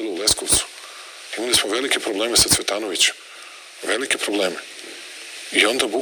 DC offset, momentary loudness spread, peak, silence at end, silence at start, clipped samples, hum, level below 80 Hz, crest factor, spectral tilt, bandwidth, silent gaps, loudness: under 0.1%; 20 LU; 0 dBFS; 0 s; 0 s; under 0.1%; none; -48 dBFS; 22 dB; -1 dB/octave; 19.5 kHz; none; -19 LUFS